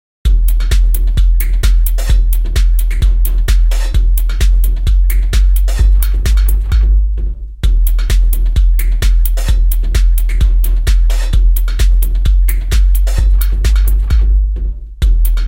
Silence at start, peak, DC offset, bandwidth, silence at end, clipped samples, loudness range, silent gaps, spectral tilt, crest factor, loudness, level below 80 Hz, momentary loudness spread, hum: 0.25 s; 0 dBFS; under 0.1%; 17 kHz; 0 s; under 0.1%; 1 LU; none; -5 dB/octave; 10 dB; -14 LUFS; -10 dBFS; 2 LU; none